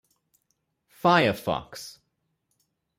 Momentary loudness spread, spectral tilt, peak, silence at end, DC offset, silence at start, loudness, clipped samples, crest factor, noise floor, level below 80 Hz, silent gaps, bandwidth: 20 LU; -5 dB/octave; -8 dBFS; 1.1 s; under 0.1%; 1.05 s; -24 LUFS; under 0.1%; 22 dB; -77 dBFS; -62 dBFS; none; 16 kHz